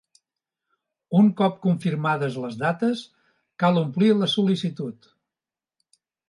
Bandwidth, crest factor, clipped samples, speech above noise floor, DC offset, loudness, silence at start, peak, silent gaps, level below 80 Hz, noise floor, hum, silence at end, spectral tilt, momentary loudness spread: 11.5 kHz; 16 dB; under 0.1%; over 68 dB; under 0.1%; -23 LUFS; 1.1 s; -8 dBFS; none; -72 dBFS; under -90 dBFS; none; 1.35 s; -7 dB/octave; 10 LU